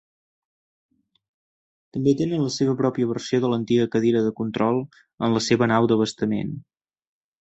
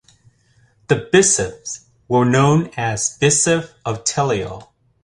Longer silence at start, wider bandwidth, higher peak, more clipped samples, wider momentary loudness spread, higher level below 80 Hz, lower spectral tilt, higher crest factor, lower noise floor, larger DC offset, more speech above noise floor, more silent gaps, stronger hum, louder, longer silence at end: first, 1.95 s vs 0.9 s; second, 8.2 kHz vs 11.5 kHz; about the same, -4 dBFS vs -2 dBFS; neither; second, 8 LU vs 17 LU; second, -60 dBFS vs -48 dBFS; first, -6 dB/octave vs -4 dB/octave; about the same, 18 dB vs 18 dB; first, under -90 dBFS vs -57 dBFS; neither; first, over 68 dB vs 39 dB; first, 5.14-5.18 s vs none; neither; second, -22 LUFS vs -17 LUFS; first, 0.8 s vs 0.4 s